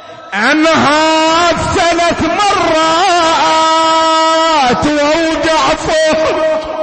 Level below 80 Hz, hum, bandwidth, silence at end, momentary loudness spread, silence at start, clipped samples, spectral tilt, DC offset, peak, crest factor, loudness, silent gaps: -36 dBFS; none; 8.8 kHz; 0 s; 3 LU; 0 s; under 0.1%; -3 dB/octave; under 0.1%; -2 dBFS; 8 dB; -10 LUFS; none